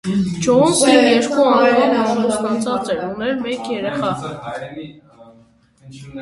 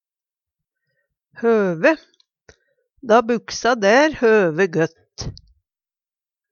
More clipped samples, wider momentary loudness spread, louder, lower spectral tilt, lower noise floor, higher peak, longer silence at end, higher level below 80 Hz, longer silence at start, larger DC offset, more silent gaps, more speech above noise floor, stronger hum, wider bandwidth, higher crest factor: neither; about the same, 17 LU vs 18 LU; about the same, -16 LUFS vs -17 LUFS; about the same, -4.5 dB/octave vs -5 dB/octave; second, -51 dBFS vs under -90 dBFS; about the same, 0 dBFS vs -2 dBFS; second, 0 s vs 1.2 s; about the same, -52 dBFS vs -52 dBFS; second, 0.05 s vs 1.4 s; neither; neither; second, 34 dB vs over 73 dB; neither; first, 11.5 kHz vs 7.2 kHz; about the same, 18 dB vs 20 dB